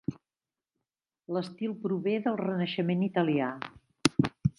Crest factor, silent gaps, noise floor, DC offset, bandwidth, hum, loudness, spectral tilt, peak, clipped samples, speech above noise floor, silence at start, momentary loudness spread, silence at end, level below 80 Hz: 28 dB; none; under -90 dBFS; under 0.1%; 11.5 kHz; none; -30 LUFS; -6 dB/octave; -4 dBFS; under 0.1%; over 60 dB; 0.1 s; 8 LU; 0.1 s; -60 dBFS